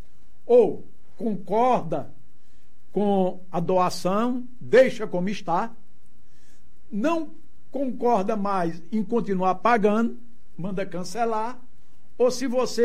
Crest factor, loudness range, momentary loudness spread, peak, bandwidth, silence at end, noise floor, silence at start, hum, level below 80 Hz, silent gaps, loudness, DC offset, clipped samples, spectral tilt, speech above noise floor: 18 dB; 4 LU; 13 LU; -6 dBFS; 14 kHz; 0 s; -61 dBFS; 0.45 s; none; -62 dBFS; none; -24 LUFS; 4%; under 0.1%; -6 dB/octave; 38 dB